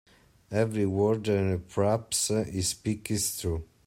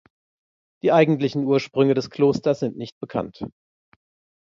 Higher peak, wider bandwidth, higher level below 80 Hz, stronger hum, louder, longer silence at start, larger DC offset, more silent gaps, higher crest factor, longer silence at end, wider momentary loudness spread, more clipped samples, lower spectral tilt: second, -12 dBFS vs -4 dBFS; first, 16 kHz vs 7.4 kHz; first, -54 dBFS vs -60 dBFS; neither; second, -28 LUFS vs -21 LUFS; second, 0.5 s vs 0.85 s; neither; second, none vs 2.92-3.01 s; about the same, 18 dB vs 18 dB; second, 0.2 s vs 0.9 s; second, 6 LU vs 16 LU; neither; second, -4.5 dB/octave vs -7.5 dB/octave